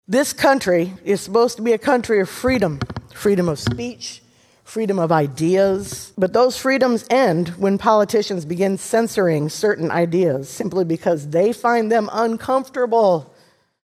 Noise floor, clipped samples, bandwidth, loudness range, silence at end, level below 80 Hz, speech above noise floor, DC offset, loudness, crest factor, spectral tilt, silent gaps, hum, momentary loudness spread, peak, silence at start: -55 dBFS; under 0.1%; 14.5 kHz; 3 LU; 0.6 s; -50 dBFS; 37 dB; under 0.1%; -19 LUFS; 18 dB; -5.5 dB/octave; none; none; 8 LU; 0 dBFS; 0.1 s